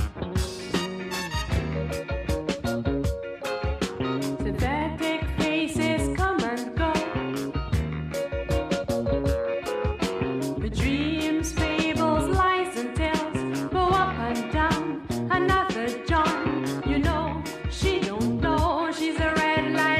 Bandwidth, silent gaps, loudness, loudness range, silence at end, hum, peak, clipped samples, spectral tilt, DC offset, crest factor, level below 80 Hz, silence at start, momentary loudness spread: 15.5 kHz; none; -26 LUFS; 4 LU; 0 s; none; -10 dBFS; under 0.1%; -5.5 dB/octave; under 0.1%; 16 dB; -36 dBFS; 0 s; 7 LU